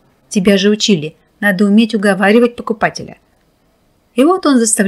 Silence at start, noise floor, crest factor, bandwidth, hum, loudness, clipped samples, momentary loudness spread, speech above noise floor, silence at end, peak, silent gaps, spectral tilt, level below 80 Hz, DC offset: 0.3 s; -56 dBFS; 12 dB; 14.5 kHz; none; -12 LUFS; under 0.1%; 10 LU; 44 dB; 0 s; 0 dBFS; none; -4.5 dB/octave; -52 dBFS; under 0.1%